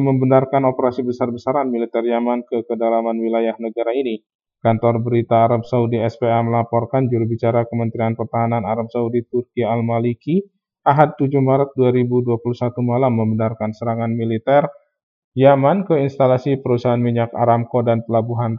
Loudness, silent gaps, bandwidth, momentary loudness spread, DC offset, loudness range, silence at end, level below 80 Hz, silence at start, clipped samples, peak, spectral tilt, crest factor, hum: -18 LUFS; 4.35-4.39 s, 15.03-15.32 s; 6.6 kHz; 7 LU; under 0.1%; 3 LU; 0 s; -64 dBFS; 0 s; under 0.1%; 0 dBFS; -10 dB/octave; 18 dB; none